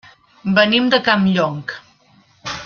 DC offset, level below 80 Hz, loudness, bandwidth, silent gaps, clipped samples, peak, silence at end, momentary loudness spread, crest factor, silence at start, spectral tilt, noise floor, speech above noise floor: under 0.1%; -56 dBFS; -15 LUFS; 7 kHz; none; under 0.1%; 0 dBFS; 0 s; 18 LU; 18 dB; 0.45 s; -5.5 dB/octave; -53 dBFS; 38 dB